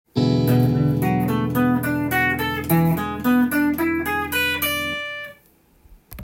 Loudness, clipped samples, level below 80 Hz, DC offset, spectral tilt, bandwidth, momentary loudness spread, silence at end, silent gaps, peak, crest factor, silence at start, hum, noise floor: -20 LUFS; under 0.1%; -48 dBFS; under 0.1%; -6 dB/octave; 17 kHz; 5 LU; 0 s; none; -6 dBFS; 14 dB; 0.15 s; none; -56 dBFS